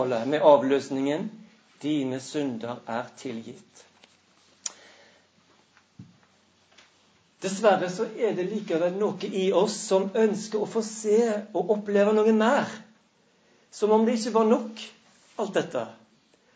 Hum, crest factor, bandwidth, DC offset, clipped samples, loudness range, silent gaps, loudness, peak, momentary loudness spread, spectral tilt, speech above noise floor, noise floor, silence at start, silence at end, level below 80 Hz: none; 22 dB; 8 kHz; under 0.1%; under 0.1%; 18 LU; none; -25 LUFS; -4 dBFS; 16 LU; -5 dB/octave; 39 dB; -64 dBFS; 0 s; 0.6 s; -80 dBFS